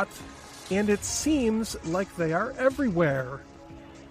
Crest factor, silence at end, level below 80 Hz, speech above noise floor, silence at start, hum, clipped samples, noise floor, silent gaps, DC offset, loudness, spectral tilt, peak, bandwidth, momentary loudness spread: 18 dB; 0 s; -50 dBFS; 19 dB; 0 s; none; under 0.1%; -46 dBFS; none; under 0.1%; -27 LUFS; -5 dB/octave; -10 dBFS; 15.5 kHz; 19 LU